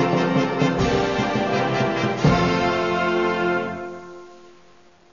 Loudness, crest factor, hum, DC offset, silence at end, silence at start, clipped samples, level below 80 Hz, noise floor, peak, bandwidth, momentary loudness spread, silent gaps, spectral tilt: -21 LUFS; 16 dB; none; 0.3%; 0.75 s; 0 s; under 0.1%; -42 dBFS; -53 dBFS; -6 dBFS; 7.4 kHz; 11 LU; none; -6 dB/octave